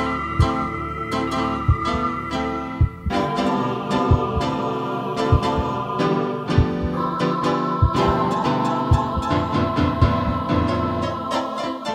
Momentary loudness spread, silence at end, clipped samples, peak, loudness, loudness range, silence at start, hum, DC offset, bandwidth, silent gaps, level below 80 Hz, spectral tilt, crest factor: 5 LU; 0 s; under 0.1%; -4 dBFS; -21 LUFS; 2 LU; 0 s; none; under 0.1%; 11.5 kHz; none; -32 dBFS; -7 dB/octave; 18 dB